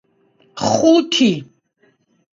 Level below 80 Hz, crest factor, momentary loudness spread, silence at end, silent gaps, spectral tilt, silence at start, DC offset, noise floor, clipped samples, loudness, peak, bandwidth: -60 dBFS; 18 dB; 14 LU; 0.9 s; none; -4.5 dB/octave; 0.55 s; under 0.1%; -60 dBFS; under 0.1%; -15 LUFS; 0 dBFS; 7.8 kHz